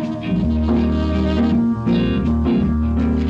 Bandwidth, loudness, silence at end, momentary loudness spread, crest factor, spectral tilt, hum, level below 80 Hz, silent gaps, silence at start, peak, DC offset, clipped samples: 7 kHz; -18 LUFS; 0 s; 2 LU; 10 dB; -9 dB/octave; none; -26 dBFS; none; 0 s; -6 dBFS; under 0.1%; under 0.1%